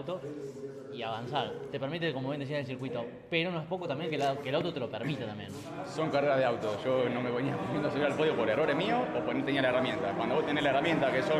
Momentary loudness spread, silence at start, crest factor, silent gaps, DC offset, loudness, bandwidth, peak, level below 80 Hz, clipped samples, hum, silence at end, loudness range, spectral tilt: 11 LU; 0 s; 16 dB; none; under 0.1%; -32 LUFS; 13.5 kHz; -16 dBFS; -66 dBFS; under 0.1%; none; 0 s; 5 LU; -6 dB/octave